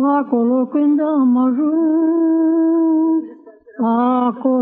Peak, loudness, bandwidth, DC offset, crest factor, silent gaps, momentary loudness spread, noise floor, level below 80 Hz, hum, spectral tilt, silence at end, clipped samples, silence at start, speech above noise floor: -6 dBFS; -16 LUFS; 3.7 kHz; under 0.1%; 10 dB; none; 4 LU; -41 dBFS; -74 dBFS; none; -11 dB/octave; 0 s; under 0.1%; 0 s; 26 dB